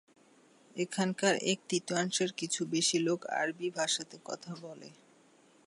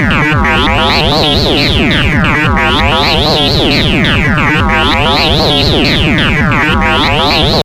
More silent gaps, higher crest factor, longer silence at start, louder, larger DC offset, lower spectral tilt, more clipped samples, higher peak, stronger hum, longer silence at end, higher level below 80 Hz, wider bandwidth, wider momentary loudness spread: neither; first, 22 dB vs 8 dB; first, 0.75 s vs 0 s; second, -32 LUFS vs -8 LUFS; neither; second, -3 dB/octave vs -5 dB/octave; neither; second, -14 dBFS vs 0 dBFS; neither; first, 0.75 s vs 0 s; second, -84 dBFS vs -20 dBFS; second, 11.5 kHz vs 16.5 kHz; first, 15 LU vs 1 LU